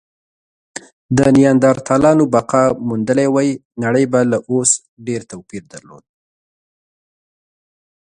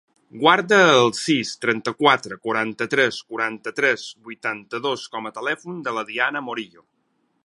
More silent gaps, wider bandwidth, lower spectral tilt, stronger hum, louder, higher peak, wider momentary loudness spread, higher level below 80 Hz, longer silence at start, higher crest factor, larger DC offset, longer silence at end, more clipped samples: first, 3.65-3.71 s, 4.88-4.97 s vs none; about the same, 11 kHz vs 11.5 kHz; first, -5.5 dB/octave vs -3.5 dB/octave; neither; first, -14 LUFS vs -21 LUFS; about the same, 0 dBFS vs 0 dBFS; first, 21 LU vs 13 LU; first, -50 dBFS vs -72 dBFS; first, 1.1 s vs 0.35 s; second, 16 dB vs 22 dB; neither; first, 2.3 s vs 0.8 s; neither